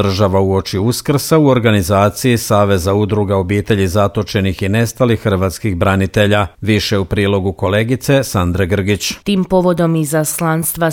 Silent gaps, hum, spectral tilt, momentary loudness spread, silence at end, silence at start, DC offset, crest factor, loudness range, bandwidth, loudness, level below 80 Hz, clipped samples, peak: none; none; -5.5 dB/octave; 4 LU; 0 s; 0 s; under 0.1%; 14 dB; 2 LU; 18 kHz; -14 LUFS; -38 dBFS; under 0.1%; 0 dBFS